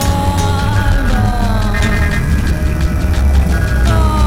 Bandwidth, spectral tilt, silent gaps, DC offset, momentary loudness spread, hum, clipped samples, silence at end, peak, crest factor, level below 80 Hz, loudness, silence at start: 16 kHz; -6 dB/octave; none; under 0.1%; 3 LU; none; under 0.1%; 0 s; -2 dBFS; 10 dB; -14 dBFS; -14 LUFS; 0 s